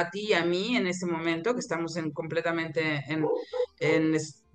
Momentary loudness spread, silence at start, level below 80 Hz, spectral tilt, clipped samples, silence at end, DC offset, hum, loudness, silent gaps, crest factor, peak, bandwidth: 6 LU; 0 s; -70 dBFS; -5 dB/octave; under 0.1%; 0.2 s; under 0.1%; none; -28 LUFS; none; 18 dB; -10 dBFS; 9.4 kHz